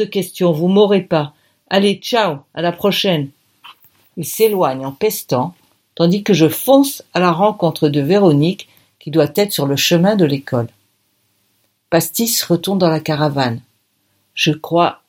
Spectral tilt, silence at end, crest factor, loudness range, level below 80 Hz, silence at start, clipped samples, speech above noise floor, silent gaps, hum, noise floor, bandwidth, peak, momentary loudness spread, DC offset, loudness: -5 dB/octave; 0.15 s; 16 dB; 4 LU; -60 dBFS; 0 s; under 0.1%; 48 dB; none; none; -63 dBFS; 17 kHz; 0 dBFS; 9 LU; under 0.1%; -15 LUFS